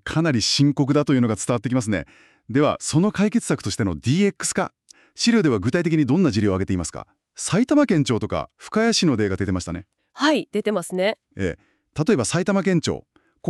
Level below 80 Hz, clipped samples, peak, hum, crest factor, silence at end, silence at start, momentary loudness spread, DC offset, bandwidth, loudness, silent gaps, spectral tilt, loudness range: -50 dBFS; under 0.1%; -6 dBFS; none; 16 dB; 0 s; 0.05 s; 10 LU; under 0.1%; 12.5 kHz; -21 LUFS; none; -5 dB/octave; 2 LU